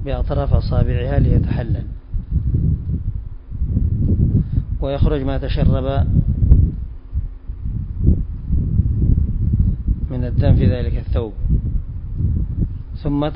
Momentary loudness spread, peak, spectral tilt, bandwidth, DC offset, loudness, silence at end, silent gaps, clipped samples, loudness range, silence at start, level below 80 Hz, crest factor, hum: 12 LU; 0 dBFS; -13 dB/octave; 5.4 kHz; under 0.1%; -20 LUFS; 0 s; none; under 0.1%; 2 LU; 0 s; -20 dBFS; 18 dB; none